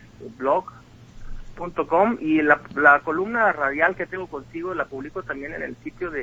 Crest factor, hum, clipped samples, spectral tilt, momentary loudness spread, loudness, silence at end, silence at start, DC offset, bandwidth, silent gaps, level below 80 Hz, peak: 22 dB; none; under 0.1%; -7 dB/octave; 16 LU; -22 LUFS; 0 s; 0 s; under 0.1%; 7.8 kHz; none; -46 dBFS; 0 dBFS